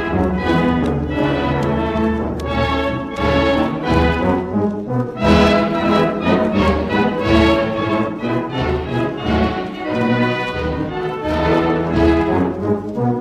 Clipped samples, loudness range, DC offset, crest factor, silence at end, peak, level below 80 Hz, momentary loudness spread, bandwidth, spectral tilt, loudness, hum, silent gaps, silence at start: under 0.1%; 3 LU; under 0.1%; 16 dB; 0 s; -2 dBFS; -30 dBFS; 7 LU; 12 kHz; -7.5 dB/octave; -17 LUFS; none; none; 0 s